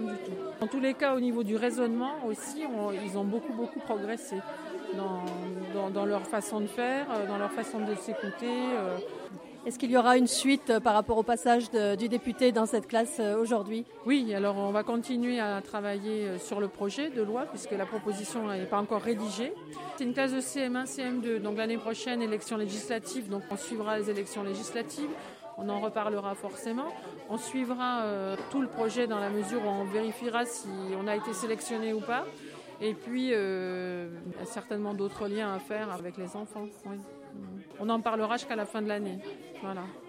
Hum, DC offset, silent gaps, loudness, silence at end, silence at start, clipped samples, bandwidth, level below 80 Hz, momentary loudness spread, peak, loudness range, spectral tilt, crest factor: none; under 0.1%; none; -32 LUFS; 0 s; 0 s; under 0.1%; 16 kHz; -68 dBFS; 12 LU; -10 dBFS; 8 LU; -4.5 dB/octave; 22 dB